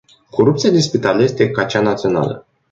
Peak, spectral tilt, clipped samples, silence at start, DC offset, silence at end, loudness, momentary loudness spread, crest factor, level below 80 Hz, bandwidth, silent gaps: -2 dBFS; -6 dB/octave; under 0.1%; 0.35 s; under 0.1%; 0.3 s; -16 LUFS; 8 LU; 14 dB; -52 dBFS; 7.8 kHz; none